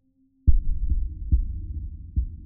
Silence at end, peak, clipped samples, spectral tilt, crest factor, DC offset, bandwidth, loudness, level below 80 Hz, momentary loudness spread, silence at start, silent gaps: 0 s; -4 dBFS; under 0.1%; -18 dB/octave; 18 dB; under 0.1%; 0.4 kHz; -29 LUFS; -26 dBFS; 10 LU; 0.45 s; none